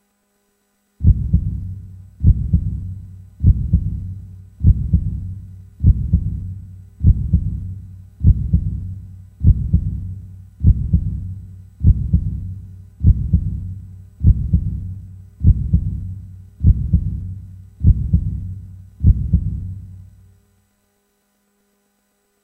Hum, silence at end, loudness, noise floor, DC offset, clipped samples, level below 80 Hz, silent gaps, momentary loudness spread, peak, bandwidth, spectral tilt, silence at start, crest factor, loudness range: none; 2.4 s; -19 LUFS; -65 dBFS; under 0.1%; under 0.1%; -22 dBFS; none; 19 LU; 0 dBFS; 0.8 kHz; -12.5 dB/octave; 1 s; 18 dB; 2 LU